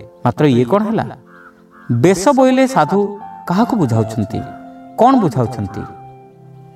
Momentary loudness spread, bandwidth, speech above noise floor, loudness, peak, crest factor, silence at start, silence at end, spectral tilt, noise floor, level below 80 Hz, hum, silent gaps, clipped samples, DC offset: 17 LU; 14 kHz; 28 dB; -15 LUFS; 0 dBFS; 16 dB; 0 s; 0.6 s; -7 dB/octave; -42 dBFS; -50 dBFS; none; none; under 0.1%; under 0.1%